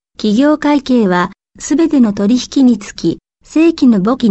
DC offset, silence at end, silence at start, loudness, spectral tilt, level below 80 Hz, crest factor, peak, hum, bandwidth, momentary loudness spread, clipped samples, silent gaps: 0.1%; 0 s; 0.2 s; -12 LUFS; -6 dB/octave; -46 dBFS; 10 dB; -2 dBFS; none; 8.4 kHz; 8 LU; under 0.1%; none